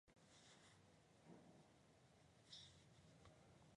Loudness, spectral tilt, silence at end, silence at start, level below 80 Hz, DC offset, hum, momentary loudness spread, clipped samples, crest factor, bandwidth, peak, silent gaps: -66 LUFS; -3.5 dB/octave; 0 s; 0.05 s; -84 dBFS; under 0.1%; none; 7 LU; under 0.1%; 24 dB; 11 kHz; -46 dBFS; none